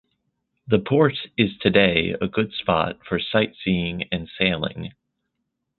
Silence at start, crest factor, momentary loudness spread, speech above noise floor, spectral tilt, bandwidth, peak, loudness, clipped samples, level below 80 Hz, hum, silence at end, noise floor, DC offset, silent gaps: 0.65 s; 22 dB; 10 LU; 56 dB; -10.5 dB/octave; 4.4 kHz; -2 dBFS; -22 LUFS; under 0.1%; -48 dBFS; none; 0.9 s; -78 dBFS; under 0.1%; none